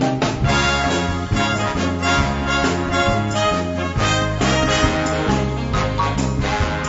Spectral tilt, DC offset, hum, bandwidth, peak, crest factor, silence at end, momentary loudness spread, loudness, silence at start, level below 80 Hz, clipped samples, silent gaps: -5 dB/octave; 0.3%; none; 8 kHz; -2 dBFS; 16 dB; 0 s; 4 LU; -19 LUFS; 0 s; -30 dBFS; under 0.1%; none